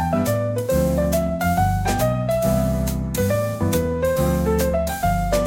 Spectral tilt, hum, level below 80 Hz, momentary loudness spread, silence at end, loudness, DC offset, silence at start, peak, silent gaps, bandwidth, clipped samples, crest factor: -6 dB/octave; none; -30 dBFS; 2 LU; 0 s; -21 LUFS; under 0.1%; 0 s; -6 dBFS; none; 17 kHz; under 0.1%; 14 dB